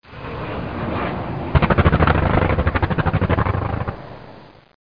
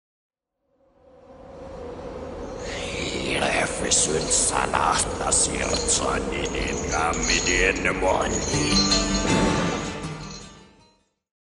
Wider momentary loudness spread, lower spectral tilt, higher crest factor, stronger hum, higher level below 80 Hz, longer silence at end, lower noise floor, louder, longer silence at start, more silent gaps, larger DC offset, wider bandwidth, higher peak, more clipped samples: about the same, 14 LU vs 16 LU; first, -10 dB/octave vs -2.5 dB/octave; about the same, 18 dB vs 20 dB; neither; first, -28 dBFS vs -38 dBFS; second, 0.45 s vs 0.85 s; second, -43 dBFS vs -72 dBFS; about the same, -20 LUFS vs -22 LUFS; second, 0.05 s vs 1.3 s; neither; first, 0.6% vs under 0.1%; second, 5.2 kHz vs 11 kHz; about the same, -2 dBFS vs -4 dBFS; neither